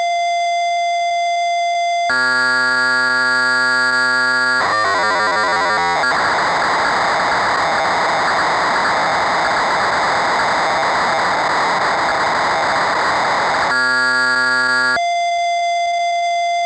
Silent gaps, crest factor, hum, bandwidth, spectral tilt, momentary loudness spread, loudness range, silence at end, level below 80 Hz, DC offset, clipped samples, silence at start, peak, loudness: none; 8 dB; none; 8 kHz; -2 dB/octave; 4 LU; 2 LU; 0 s; -52 dBFS; under 0.1%; under 0.1%; 0 s; -8 dBFS; -15 LUFS